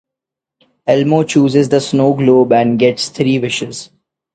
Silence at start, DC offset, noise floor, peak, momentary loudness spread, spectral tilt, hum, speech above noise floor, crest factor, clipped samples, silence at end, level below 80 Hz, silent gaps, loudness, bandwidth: 0.85 s; under 0.1%; -83 dBFS; 0 dBFS; 10 LU; -6 dB/octave; none; 71 dB; 14 dB; under 0.1%; 0.5 s; -54 dBFS; none; -13 LUFS; 9.2 kHz